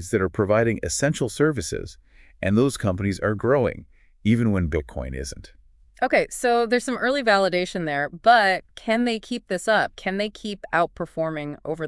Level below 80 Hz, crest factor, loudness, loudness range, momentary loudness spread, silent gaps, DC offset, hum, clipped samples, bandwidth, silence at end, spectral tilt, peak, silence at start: -46 dBFS; 20 dB; -23 LUFS; 4 LU; 12 LU; none; under 0.1%; none; under 0.1%; 12 kHz; 0 s; -5 dB/octave; -4 dBFS; 0 s